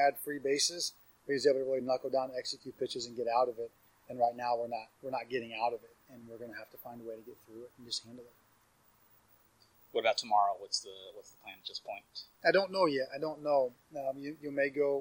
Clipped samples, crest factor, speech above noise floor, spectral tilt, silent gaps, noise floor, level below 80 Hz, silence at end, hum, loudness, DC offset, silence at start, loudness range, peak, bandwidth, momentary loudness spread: under 0.1%; 22 dB; 34 dB; -2.5 dB/octave; none; -68 dBFS; -80 dBFS; 0 s; none; -34 LUFS; under 0.1%; 0 s; 12 LU; -14 dBFS; 16 kHz; 19 LU